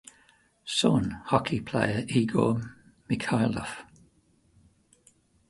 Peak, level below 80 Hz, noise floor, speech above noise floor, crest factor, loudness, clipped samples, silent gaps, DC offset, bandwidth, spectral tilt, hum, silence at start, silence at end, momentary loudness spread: -6 dBFS; -56 dBFS; -65 dBFS; 38 dB; 24 dB; -27 LUFS; under 0.1%; none; under 0.1%; 11.5 kHz; -5.5 dB/octave; none; 0.65 s; 1.65 s; 13 LU